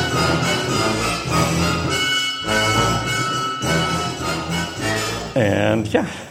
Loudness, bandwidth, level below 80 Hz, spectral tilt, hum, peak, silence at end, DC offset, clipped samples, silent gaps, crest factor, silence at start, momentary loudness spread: -19 LUFS; 16 kHz; -40 dBFS; -4 dB/octave; none; -2 dBFS; 0 s; under 0.1%; under 0.1%; none; 18 dB; 0 s; 5 LU